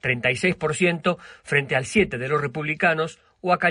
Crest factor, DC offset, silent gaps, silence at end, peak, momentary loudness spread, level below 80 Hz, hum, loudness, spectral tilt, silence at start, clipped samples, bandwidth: 18 dB; under 0.1%; none; 0 s; -6 dBFS; 6 LU; -52 dBFS; none; -23 LUFS; -5 dB/octave; 0.05 s; under 0.1%; 10.5 kHz